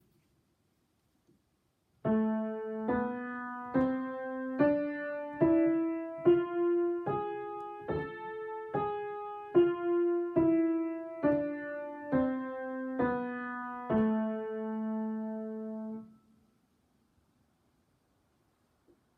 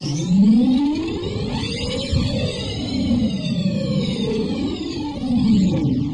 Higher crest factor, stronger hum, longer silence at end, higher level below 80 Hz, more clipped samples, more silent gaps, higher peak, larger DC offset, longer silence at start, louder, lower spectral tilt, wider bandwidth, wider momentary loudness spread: first, 18 dB vs 12 dB; neither; first, 3.1 s vs 0 s; second, -66 dBFS vs -36 dBFS; neither; neither; second, -14 dBFS vs -8 dBFS; neither; first, 2.05 s vs 0 s; second, -33 LUFS vs -20 LUFS; first, -10 dB/octave vs -6.5 dB/octave; second, 4.2 kHz vs 10.5 kHz; first, 12 LU vs 9 LU